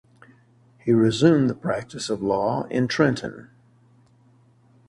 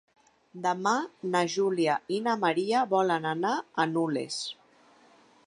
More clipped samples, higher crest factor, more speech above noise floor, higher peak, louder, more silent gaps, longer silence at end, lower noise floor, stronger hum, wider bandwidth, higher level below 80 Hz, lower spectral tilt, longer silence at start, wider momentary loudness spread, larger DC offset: neither; about the same, 20 dB vs 18 dB; first, 36 dB vs 32 dB; first, -4 dBFS vs -12 dBFS; first, -22 LUFS vs -28 LUFS; neither; first, 1.45 s vs 0.95 s; about the same, -57 dBFS vs -60 dBFS; neither; about the same, 11.5 kHz vs 11 kHz; first, -58 dBFS vs -80 dBFS; first, -6.5 dB/octave vs -4.5 dB/octave; first, 0.85 s vs 0.55 s; first, 12 LU vs 7 LU; neither